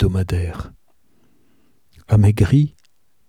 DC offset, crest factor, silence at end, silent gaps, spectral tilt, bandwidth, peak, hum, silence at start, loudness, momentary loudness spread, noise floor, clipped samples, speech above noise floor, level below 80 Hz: 0.2%; 18 dB; 0.6 s; none; -8.5 dB/octave; 12.5 kHz; -2 dBFS; none; 0 s; -18 LUFS; 17 LU; -64 dBFS; under 0.1%; 48 dB; -34 dBFS